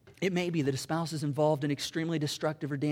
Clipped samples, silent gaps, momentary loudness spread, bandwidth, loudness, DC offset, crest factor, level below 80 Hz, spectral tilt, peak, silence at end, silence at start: under 0.1%; none; 5 LU; 16.5 kHz; -31 LUFS; under 0.1%; 16 dB; -68 dBFS; -5.5 dB/octave; -16 dBFS; 0 s; 0.05 s